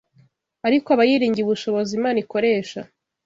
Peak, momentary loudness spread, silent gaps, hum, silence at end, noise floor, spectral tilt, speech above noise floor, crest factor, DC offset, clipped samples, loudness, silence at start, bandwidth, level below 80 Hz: -4 dBFS; 9 LU; none; none; 0.4 s; -58 dBFS; -5.5 dB/octave; 39 dB; 16 dB; under 0.1%; under 0.1%; -20 LUFS; 0.65 s; 7.8 kHz; -64 dBFS